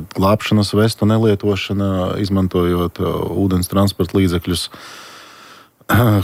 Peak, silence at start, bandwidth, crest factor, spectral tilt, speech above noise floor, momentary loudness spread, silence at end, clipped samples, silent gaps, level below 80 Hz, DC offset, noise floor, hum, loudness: -2 dBFS; 0 s; 16 kHz; 14 dB; -6.5 dB/octave; 27 dB; 7 LU; 0 s; under 0.1%; none; -42 dBFS; under 0.1%; -43 dBFS; none; -17 LUFS